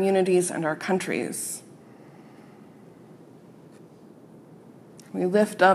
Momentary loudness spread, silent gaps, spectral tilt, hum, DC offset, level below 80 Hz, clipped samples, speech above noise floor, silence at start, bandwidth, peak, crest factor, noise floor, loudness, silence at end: 27 LU; none; -5 dB/octave; none; under 0.1%; -80 dBFS; under 0.1%; 26 dB; 0 s; 14 kHz; -6 dBFS; 22 dB; -49 dBFS; -25 LUFS; 0 s